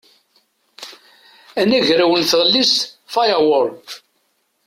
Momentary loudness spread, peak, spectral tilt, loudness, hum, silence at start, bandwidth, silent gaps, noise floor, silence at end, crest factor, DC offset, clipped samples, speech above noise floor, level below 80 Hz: 23 LU; -2 dBFS; -3 dB/octave; -15 LUFS; none; 0.8 s; 16.5 kHz; none; -65 dBFS; 0.7 s; 16 dB; under 0.1%; under 0.1%; 50 dB; -62 dBFS